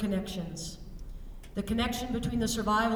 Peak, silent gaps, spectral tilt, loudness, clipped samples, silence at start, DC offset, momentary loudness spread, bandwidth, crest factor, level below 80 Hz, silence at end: -16 dBFS; none; -4.5 dB/octave; -32 LUFS; under 0.1%; 0 s; under 0.1%; 19 LU; 18 kHz; 16 dB; -44 dBFS; 0 s